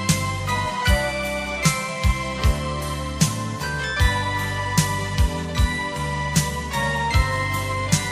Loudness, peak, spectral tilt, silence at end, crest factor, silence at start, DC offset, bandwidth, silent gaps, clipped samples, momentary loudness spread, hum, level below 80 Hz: -23 LUFS; -4 dBFS; -4 dB/octave; 0 s; 18 dB; 0 s; under 0.1%; 15.5 kHz; none; under 0.1%; 5 LU; none; -28 dBFS